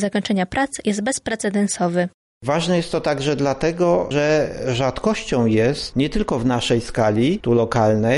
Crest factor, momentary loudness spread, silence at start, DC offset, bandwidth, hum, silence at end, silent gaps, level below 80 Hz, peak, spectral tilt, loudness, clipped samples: 14 dB; 5 LU; 0 s; under 0.1%; 11.5 kHz; none; 0 s; 2.14-2.41 s; -40 dBFS; -6 dBFS; -5.5 dB/octave; -20 LUFS; under 0.1%